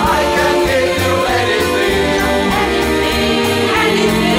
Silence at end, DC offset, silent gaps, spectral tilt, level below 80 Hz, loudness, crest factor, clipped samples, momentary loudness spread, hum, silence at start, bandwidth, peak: 0 s; under 0.1%; none; -4 dB/octave; -30 dBFS; -13 LUFS; 10 dB; under 0.1%; 2 LU; none; 0 s; 16.5 kHz; -2 dBFS